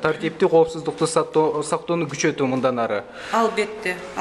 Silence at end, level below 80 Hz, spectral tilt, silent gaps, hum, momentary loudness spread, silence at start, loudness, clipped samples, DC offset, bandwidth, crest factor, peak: 0 s; -58 dBFS; -5 dB/octave; none; none; 7 LU; 0 s; -22 LUFS; under 0.1%; under 0.1%; 12 kHz; 16 dB; -6 dBFS